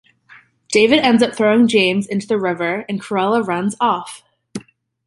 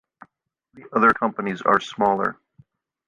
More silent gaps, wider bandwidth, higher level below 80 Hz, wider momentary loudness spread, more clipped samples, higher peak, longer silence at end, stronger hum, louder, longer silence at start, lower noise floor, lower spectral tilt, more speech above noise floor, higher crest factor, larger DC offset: neither; about the same, 11.5 kHz vs 10.5 kHz; about the same, -60 dBFS vs -62 dBFS; first, 21 LU vs 8 LU; neither; about the same, -2 dBFS vs -2 dBFS; second, 0.5 s vs 0.75 s; neither; first, -16 LUFS vs -21 LUFS; about the same, 0.7 s vs 0.75 s; second, -48 dBFS vs -70 dBFS; second, -4.5 dB/octave vs -6 dB/octave; second, 32 dB vs 49 dB; second, 16 dB vs 22 dB; neither